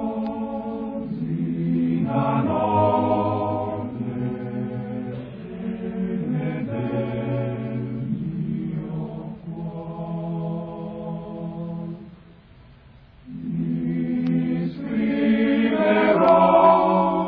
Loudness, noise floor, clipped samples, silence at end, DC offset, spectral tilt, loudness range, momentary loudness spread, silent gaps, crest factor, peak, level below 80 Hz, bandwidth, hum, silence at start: -23 LUFS; -49 dBFS; under 0.1%; 0 s; under 0.1%; -11 dB/octave; 12 LU; 15 LU; none; 20 dB; -2 dBFS; -52 dBFS; 5.2 kHz; none; 0 s